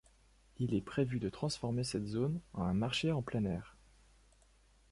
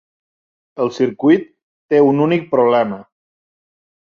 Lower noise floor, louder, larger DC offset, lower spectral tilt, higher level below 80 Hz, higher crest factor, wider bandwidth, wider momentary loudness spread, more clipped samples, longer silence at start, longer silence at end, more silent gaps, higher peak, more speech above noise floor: second, -67 dBFS vs under -90 dBFS; second, -37 LUFS vs -16 LUFS; neither; second, -6 dB/octave vs -8 dB/octave; first, -58 dBFS vs -64 dBFS; about the same, 18 dB vs 16 dB; first, 11.5 kHz vs 7.2 kHz; second, 5 LU vs 9 LU; neither; second, 0.6 s vs 0.75 s; about the same, 1.2 s vs 1.1 s; second, none vs 1.63-1.89 s; second, -20 dBFS vs -2 dBFS; second, 31 dB vs over 76 dB